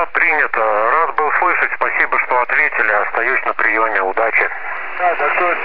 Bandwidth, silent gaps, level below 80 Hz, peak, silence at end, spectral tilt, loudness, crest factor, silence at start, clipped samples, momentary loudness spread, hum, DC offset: 5.2 kHz; none; -56 dBFS; -2 dBFS; 0 s; -6 dB/octave; -15 LUFS; 14 dB; 0 s; under 0.1%; 3 LU; none; 4%